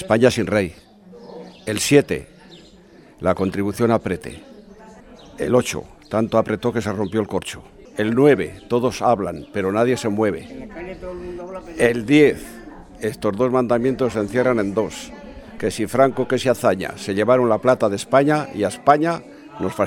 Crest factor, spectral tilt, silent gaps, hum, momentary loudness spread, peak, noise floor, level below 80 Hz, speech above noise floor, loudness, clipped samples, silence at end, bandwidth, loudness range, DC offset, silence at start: 20 dB; -5.5 dB/octave; none; none; 17 LU; 0 dBFS; -47 dBFS; -48 dBFS; 28 dB; -20 LUFS; under 0.1%; 0 s; 16.5 kHz; 4 LU; under 0.1%; 0 s